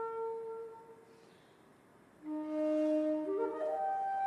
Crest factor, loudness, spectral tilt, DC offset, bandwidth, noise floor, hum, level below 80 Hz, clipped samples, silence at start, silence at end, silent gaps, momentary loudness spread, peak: 14 dB; -36 LUFS; -6.5 dB/octave; under 0.1%; 10.5 kHz; -63 dBFS; none; -84 dBFS; under 0.1%; 0 s; 0 s; none; 18 LU; -24 dBFS